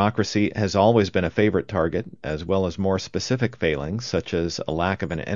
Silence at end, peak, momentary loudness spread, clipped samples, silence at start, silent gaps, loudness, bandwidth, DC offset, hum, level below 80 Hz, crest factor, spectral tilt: 0 s; -4 dBFS; 8 LU; under 0.1%; 0 s; none; -23 LUFS; 7.6 kHz; 0.3%; none; -48 dBFS; 20 dB; -6 dB/octave